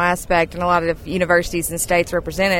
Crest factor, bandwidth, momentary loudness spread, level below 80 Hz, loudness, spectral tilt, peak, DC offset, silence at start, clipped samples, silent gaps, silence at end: 16 dB; 18 kHz; 5 LU; -36 dBFS; -19 LUFS; -4 dB/octave; -4 dBFS; under 0.1%; 0 s; under 0.1%; none; 0 s